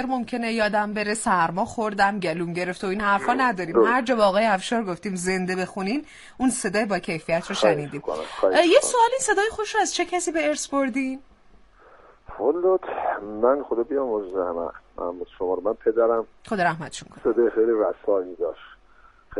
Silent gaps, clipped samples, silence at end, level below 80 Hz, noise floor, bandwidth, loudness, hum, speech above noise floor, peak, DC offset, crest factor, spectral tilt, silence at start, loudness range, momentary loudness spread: none; under 0.1%; 0 s; -54 dBFS; -53 dBFS; 11.5 kHz; -23 LUFS; none; 30 dB; -4 dBFS; under 0.1%; 20 dB; -4 dB/octave; 0 s; 4 LU; 11 LU